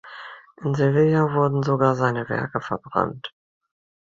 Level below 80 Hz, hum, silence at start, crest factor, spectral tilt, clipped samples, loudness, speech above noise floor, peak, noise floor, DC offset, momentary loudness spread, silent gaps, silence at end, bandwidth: -58 dBFS; none; 0.05 s; 20 dB; -8 dB/octave; under 0.1%; -22 LUFS; 20 dB; -2 dBFS; -41 dBFS; under 0.1%; 19 LU; none; 0.75 s; 7.4 kHz